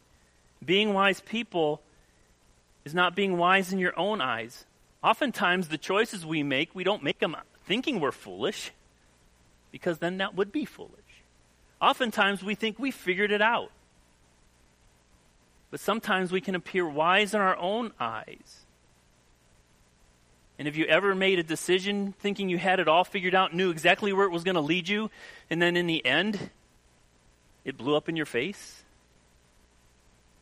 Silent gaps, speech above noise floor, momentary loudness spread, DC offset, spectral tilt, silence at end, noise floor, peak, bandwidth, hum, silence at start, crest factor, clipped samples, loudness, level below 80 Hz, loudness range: none; 35 dB; 13 LU; under 0.1%; -4.5 dB/octave; 1.65 s; -63 dBFS; -6 dBFS; 15.5 kHz; 60 Hz at -60 dBFS; 0.6 s; 24 dB; under 0.1%; -27 LUFS; -66 dBFS; 8 LU